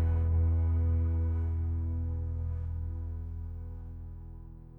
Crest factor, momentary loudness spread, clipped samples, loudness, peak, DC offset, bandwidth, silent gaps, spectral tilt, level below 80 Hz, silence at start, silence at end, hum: 10 dB; 17 LU; under 0.1%; -33 LUFS; -20 dBFS; under 0.1%; 2.4 kHz; none; -12 dB/octave; -34 dBFS; 0 s; 0 s; none